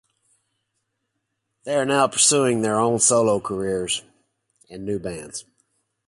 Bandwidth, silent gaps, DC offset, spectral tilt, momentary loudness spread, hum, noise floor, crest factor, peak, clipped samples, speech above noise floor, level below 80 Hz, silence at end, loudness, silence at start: 11.5 kHz; none; under 0.1%; -3 dB/octave; 18 LU; none; -77 dBFS; 20 dB; -4 dBFS; under 0.1%; 56 dB; -58 dBFS; 0.65 s; -20 LUFS; 1.65 s